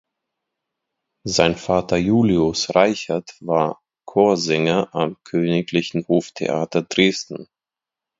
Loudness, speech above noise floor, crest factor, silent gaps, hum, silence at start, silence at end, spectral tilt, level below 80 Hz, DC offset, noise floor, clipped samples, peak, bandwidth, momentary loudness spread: -20 LUFS; 69 dB; 20 dB; none; none; 1.25 s; 0.75 s; -5 dB/octave; -50 dBFS; under 0.1%; -88 dBFS; under 0.1%; 0 dBFS; 7.8 kHz; 9 LU